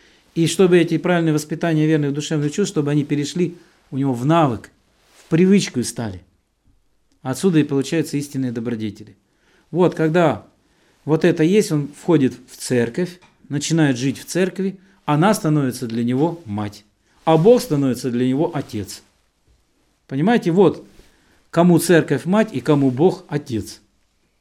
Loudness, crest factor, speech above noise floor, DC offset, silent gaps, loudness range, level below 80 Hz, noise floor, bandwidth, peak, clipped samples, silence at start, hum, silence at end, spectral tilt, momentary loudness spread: -19 LUFS; 18 dB; 45 dB; under 0.1%; none; 4 LU; -58 dBFS; -63 dBFS; 15.5 kHz; -2 dBFS; under 0.1%; 0.35 s; none; 0.65 s; -6 dB/octave; 13 LU